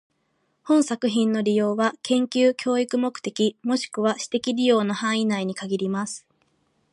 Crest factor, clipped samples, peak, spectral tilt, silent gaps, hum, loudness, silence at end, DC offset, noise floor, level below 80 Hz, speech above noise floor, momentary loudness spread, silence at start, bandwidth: 16 dB; under 0.1%; -8 dBFS; -4.5 dB/octave; none; none; -23 LUFS; 0.75 s; under 0.1%; -70 dBFS; -74 dBFS; 48 dB; 7 LU; 0.65 s; 11.5 kHz